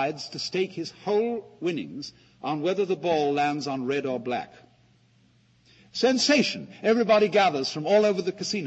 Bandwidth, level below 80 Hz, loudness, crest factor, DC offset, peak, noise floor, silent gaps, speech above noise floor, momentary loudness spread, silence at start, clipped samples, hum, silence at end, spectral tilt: 8.4 kHz; -70 dBFS; -25 LUFS; 18 dB; under 0.1%; -8 dBFS; -61 dBFS; none; 36 dB; 13 LU; 0 s; under 0.1%; none; 0 s; -4 dB/octave